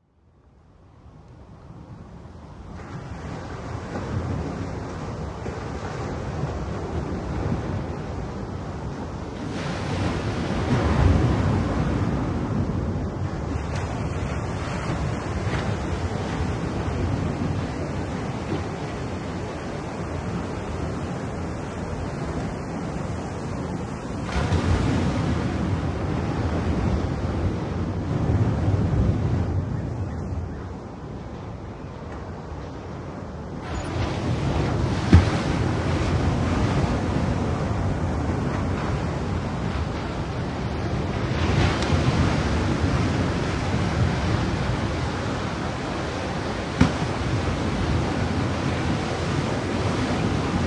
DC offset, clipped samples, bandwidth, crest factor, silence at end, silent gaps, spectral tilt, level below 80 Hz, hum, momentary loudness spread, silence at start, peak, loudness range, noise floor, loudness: under 0.1%; under 0.1%; 11 kHz; 24 dB; 0 s; none; -6.5 dB/octave; -34 dBFS; none; 12 LU; 0.8 s; -2 dBFS; 8 LU; -57 dBFS; -26 LUFS